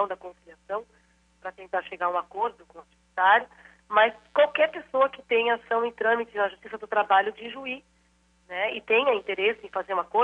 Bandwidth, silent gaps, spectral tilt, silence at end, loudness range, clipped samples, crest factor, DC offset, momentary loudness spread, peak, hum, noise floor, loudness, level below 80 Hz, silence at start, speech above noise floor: 8 kHz; none; -4.5 dB/octave; 0 s; 4 LU; under 0.1%; 20 dB; under 0.1%; 15 LU; -8 dBFS; none; -64 dBFS; -25 LUFS; -68 dBFS; 0 s; 38 dB